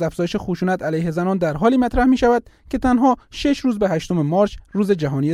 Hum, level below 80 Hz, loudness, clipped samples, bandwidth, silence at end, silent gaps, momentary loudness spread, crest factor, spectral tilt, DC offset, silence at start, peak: none; -38 dBFS; -19 LUFS; under 0.1%; 12.5 kHz; 0 s; none; 6 LU; 14 dB; -7 dB/octave; under 0.1%; 0 s; -4 dBFS